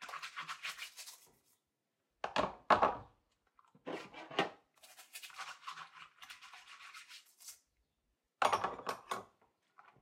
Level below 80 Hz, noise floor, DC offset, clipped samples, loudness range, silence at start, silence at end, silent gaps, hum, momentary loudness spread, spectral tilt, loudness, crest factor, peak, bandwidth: -72 dBFS; -86 dBFS; under 0.1%; under 0.1%; 13 LU; 0 s; 0.75 s; none; none; 21 LU; -3 dB/octave; -39 LUFS; 28 dB; -14 dBFS; 16 kHz